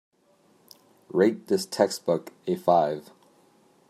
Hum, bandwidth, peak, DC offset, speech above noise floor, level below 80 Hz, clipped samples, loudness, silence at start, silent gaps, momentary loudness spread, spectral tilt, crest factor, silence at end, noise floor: none; 16 kHz; -6 dBFS; under 0.1%; 38 dB; -76 dBFS; under 0.1%; -25 LUFS; 1.15 s; none; 8 LU; -5.5 dB/octave; 22 dB; 0.9 s; -63 dBFS